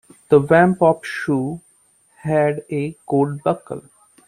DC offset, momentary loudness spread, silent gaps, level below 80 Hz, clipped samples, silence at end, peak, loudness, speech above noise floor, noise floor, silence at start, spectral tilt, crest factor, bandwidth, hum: under 0.1%; 17 LU; none; -54 dBFS; under 0.1%; 0.5 s; -2 dBFS; -19 LUFS; 40 dB; -57 dBFS; 0.3 s; -7.5 dB/octave; 18 dB; 13 kHz; none